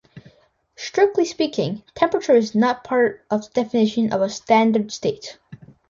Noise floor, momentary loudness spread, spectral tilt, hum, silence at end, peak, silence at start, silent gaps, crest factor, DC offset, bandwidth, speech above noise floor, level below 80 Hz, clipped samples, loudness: -58 dBFS; 10 LU; -5.5 dB/octave; none; 0.35 s; -4 dBFS; 0.15 s; none; 16 dB; under 0.1%; 7.6 kHz; 38 dB; -62 dBFS; under 0.1%; -20 LUFS